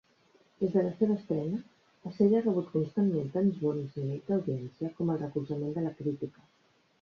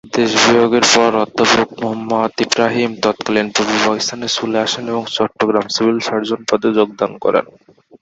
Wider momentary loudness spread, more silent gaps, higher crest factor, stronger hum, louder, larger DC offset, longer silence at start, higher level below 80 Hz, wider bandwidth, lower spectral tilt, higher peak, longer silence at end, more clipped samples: about the same, 9 LU vs 8 LU; neither; about the same, 18 dB vs 16 dB; neither; second, -31 LUFS vs -15 LUFS; neither; first, 0.6 s vs 0.05 s; second, -70 dBFS vs -54 dBFS; second, 6.4 kHz vs 8.2 kHz; first, -10.5 dB/octave vs -3 dB/octave; second, -14 dBFS vs 0 dBFS; first, 0.7 s vs 0.5 s; neither